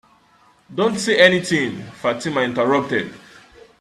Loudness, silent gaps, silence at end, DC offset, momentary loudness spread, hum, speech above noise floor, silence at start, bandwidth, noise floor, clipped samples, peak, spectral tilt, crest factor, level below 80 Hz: -18 LUFS; none; 0.65 s; under 0.1%; 12 LU; none; 36 dB; 0.7 s; 13.5 kHz; -55 dBFS; under 0.1%; 0 dBFS; -4.5 dB/octave; 20 dB; -60 dBFS